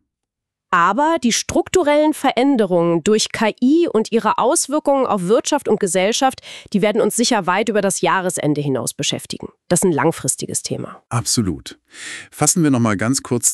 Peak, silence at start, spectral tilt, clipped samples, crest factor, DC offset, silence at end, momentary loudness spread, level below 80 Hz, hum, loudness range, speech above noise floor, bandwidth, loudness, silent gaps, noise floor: -2 dBFS; 0.7 s; -4 dB/octave; under 0.1%; 14 dB; under 0.1%; 0 s; 9 LU; -52 dBFS; none; 4 LU; 64 dB; 14 kHz; -17 LUFS; none; -82 dBFS